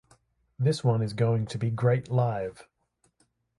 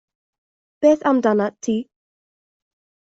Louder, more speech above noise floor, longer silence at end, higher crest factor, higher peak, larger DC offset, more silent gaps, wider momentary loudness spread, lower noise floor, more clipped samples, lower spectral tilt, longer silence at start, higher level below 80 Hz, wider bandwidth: second, -27 LUFS vs -19 LUFS; second, 46 dB vs over 72 dB; second, 0.95 s vs 1.25 s; about the same, 18 dB vs 18 dB; second, -10 dBFS vs -4 dBFS; neither; neither; second, 5 LU vs 8 LU; second, -72 dBFS vs under -90 dBFS; neither; first, -7.5 dB/octave vs -6 dB/octave; second, 0.6 s vs 0.8 s; about the same, -62 dBFS vs -66 dBFS; first, 11.5 kHz vs 7.8 kHz